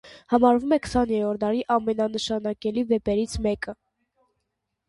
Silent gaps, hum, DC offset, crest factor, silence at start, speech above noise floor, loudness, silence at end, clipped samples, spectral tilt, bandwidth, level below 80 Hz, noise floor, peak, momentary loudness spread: none; none; under 0.1%; 20 dB; 0.05 s; 56 dB; -24 LUFS; 1.15 s; under 0.1%; -5.5 dB/octave; 11.5 kHz; -46 dBFS; -79 dBFS; -6 dBFS; 8 LU